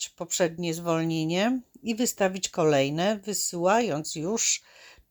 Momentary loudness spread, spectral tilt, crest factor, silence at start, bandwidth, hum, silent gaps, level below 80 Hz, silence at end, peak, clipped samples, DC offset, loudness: 6 LU; -3.5 dB/octave; 16 dB; 0 s; over 20 kHz; none; none; -66 dBFS; 0.2 s; -12 dBFS; under 0.1%; under 0.1%; -26 LUFS